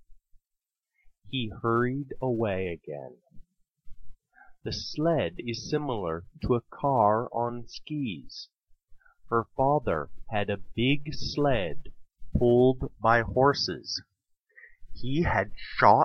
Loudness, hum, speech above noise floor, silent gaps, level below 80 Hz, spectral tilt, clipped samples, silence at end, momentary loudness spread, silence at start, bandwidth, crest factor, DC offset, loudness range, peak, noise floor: -28 LUFS; none; 60 dB; none; -46 dBFS; -6.5 dB/octave; under 0.1%; 0 s; 13 LU; 0.1 s; 6.6 kHz; 24 dB; under 0.1%; 7 LU; -6 dBFS; -87 dBFS